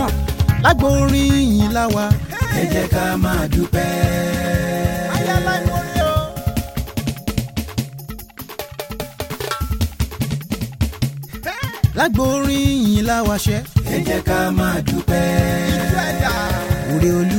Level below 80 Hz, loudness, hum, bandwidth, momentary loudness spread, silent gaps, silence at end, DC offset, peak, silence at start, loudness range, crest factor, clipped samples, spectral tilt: -28 dBFS; -19 LUFS; none; 17 kHz; 11 LU; none; 0 s; under 0.1%; -2 dBFS; 0 s; 8 LU; 16 dB; under 0.1%; -5.5 dB/octave